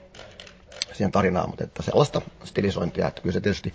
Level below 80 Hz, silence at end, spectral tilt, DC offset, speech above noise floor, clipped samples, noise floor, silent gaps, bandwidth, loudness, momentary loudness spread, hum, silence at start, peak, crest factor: -44 dBFS; 0 s; -6 dB/octave; under 0.1%; 21 dB; under 0.1%; -46 dBFS; none; 8 kHz; -25 LUFS; 21 LU; none; 0 s; -6 dBFS; 20 dB